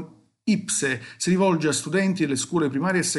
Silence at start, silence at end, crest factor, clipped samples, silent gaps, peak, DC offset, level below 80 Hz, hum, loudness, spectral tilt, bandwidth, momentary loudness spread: 0 s; 0 s; 14 dB; under 0.1%; none; -10 dBFS; under 0.1%; -68 dBFS; none; -23 LUFS; -4.5 dB/octave; 12 kHz; 6 LU